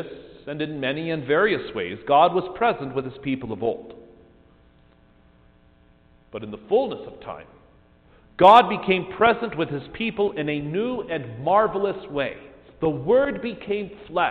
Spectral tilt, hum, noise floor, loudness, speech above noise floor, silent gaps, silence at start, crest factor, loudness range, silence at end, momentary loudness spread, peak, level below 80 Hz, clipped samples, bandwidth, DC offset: -3.5 dB/octave; 60 Hz at -55 dBFS; -56 dBFS; -22 LUFS; 34 dB; none; 0 s; 20 dB; 12 LU; 0 s; 18 LU; -4 dBFS; -54 dBFS; under 0.1%; 4.8 kHz; under 0.1%